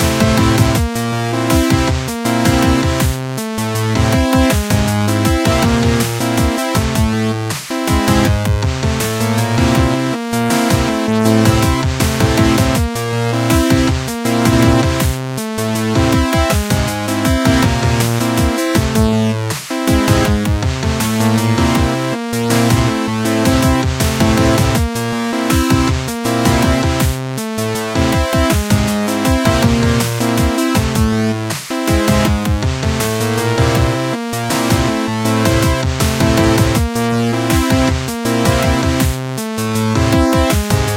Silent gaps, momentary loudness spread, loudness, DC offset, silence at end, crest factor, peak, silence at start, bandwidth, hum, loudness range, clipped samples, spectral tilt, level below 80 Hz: none; 5 LU; -14 LUFS; under 0.1%; 0 s; 14 dB; 0 dBFS; 0 s; 17 kHz; none; 1 LU; under 0.1%; -5 dB/octave; -24 dBFS